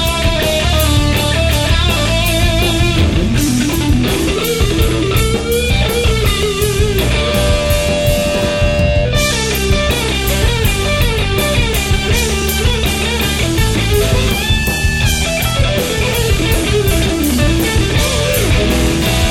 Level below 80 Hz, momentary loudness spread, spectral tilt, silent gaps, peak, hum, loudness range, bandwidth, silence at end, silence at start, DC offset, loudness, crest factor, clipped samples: -18 dBFS; 2 LU; -4.5 dB/octave; none; 0 dBFS; none; 1 LU; 17.5 kHz; 0 s; 0 s; 0.9%; -13 LUFS; 12 dB; under 0.1%